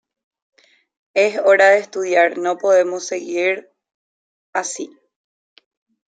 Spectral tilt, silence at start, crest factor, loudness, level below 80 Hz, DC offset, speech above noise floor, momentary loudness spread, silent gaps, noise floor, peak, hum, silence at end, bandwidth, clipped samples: -2.5 dB/octave; 1.15 s; 18 dB; -17 LUFS; -78 dBFS; under 0.1%; over 73 dB; 14 LU; 3.94-4.53 s; under -90 dBFS; -2 dBFS; none; 1.3 s; 9.4 kHz; under 0.1%